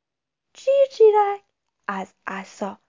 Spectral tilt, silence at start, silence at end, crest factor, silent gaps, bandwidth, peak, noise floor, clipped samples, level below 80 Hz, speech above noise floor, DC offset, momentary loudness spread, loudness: -5 dB/octave; 0.6 s; 0.15 s; 16 dB; none; 7.6 kHz; -6 dBFS; -85 dBFS; under 0.1%; -78 dBFS; 64 dB; under 0.1%; 17 LU; -20 LUFS